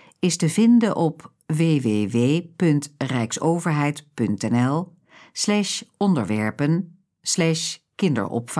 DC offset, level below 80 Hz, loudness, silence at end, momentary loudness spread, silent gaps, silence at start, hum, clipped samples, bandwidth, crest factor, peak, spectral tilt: under 0.1%; -68 dBFS; -22 LUFS; 0 s; 8 LU; none; 0.25 s; none; under 0.1%; 11 kHz; 14 dB; -8 dBFS; -5.5 dB/octave